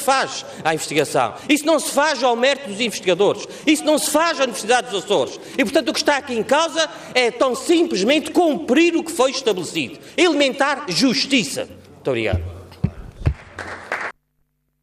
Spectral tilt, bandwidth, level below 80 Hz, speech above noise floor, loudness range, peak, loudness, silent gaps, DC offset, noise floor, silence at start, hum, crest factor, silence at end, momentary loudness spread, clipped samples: -3.5 dB/octave; 15.5 kHz; -44 dBFS; 49 dB; 4 LU; -4 dBFS; -19 LUFS; none; under 0.1%; -68 dBFS; 0 s; none; 14 dB; 0.7 s; 10 LU; under 0.1%